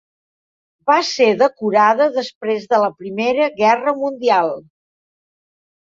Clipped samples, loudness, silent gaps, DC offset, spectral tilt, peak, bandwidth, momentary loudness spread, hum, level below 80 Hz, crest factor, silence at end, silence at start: under 0.1%; -17 LUFS; 2.35-2.41 s; under 0.1%; -4 dB/octave; -2 dBFS; 7.6 kHz; 9 LU; none; -68 dBFS; 16 dB; 1.3 s; 0.85 s